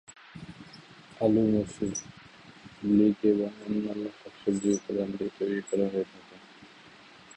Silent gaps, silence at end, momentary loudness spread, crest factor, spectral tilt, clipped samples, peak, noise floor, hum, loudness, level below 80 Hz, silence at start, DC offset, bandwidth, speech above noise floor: none; 0.7 s; 25 LU; 18 dB; -6.5 dB/octave; under 0.1%; -12 dBFS; -53 dBFS; none; -29 LUFS; -62 dBFS; 0.1 s; under 0.1%; 8.8 kHz; 25 dB